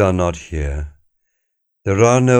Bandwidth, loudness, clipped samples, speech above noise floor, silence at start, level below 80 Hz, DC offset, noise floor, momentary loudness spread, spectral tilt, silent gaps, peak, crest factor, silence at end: 9.6 kHz; -18 LUFS; under 0.1%; 57 dB; 0 s; -30 dBFS; under 0.1%; -72 dBFS; 15 LU; -6.5 dB/octave; none; -2 dBFS; 16 dB; 0 s